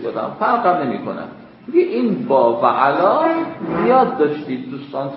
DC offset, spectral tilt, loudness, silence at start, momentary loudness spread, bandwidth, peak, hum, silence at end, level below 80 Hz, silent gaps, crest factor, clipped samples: under 0.1%; -11.5 dB/octave; -17 LUFS; 0 s; 13 LU; 5.8 kHz; 0 dBFS; none; 0 s; -60 dBFS; none; 16 dB; under 0.1%